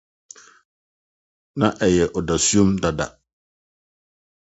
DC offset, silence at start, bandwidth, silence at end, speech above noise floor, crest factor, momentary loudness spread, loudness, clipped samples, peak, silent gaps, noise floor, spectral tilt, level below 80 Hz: under 0.1%; 1.55 s; 8.2 kHz; 1.5 s; over 71 dB; 22 dB; 12 LU; -20 LUFS; under 0.1%; -2 dBFS; none; under -90 dBFS; -4.5 dB/octave; -44 dBFS